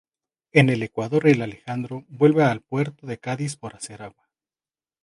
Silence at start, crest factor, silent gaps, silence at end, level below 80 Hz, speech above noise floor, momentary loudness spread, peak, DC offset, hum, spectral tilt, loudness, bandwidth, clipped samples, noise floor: 0.55 s; 22 dB; none; 0.95 s; -64 dBFS; over 68 dB; 17 LU; -2 dBFS; under 0.1%; none; -6.5 dB/octave; -22 LUFS; 11.5 kHz; under 0.1%; under -90 dBFS